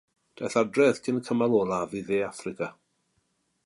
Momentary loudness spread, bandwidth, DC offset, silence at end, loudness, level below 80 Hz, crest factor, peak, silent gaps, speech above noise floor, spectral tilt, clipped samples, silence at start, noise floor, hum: 12 LU; 11.5 kHz; under 0.1%; 0.95 s; -27 LUFS; -66 dBFS; 18 dB; -10 dBFS; none; 47 dB; -5.5 dB/octave; under 0.1%; 0.4 s; -73 dBFS; none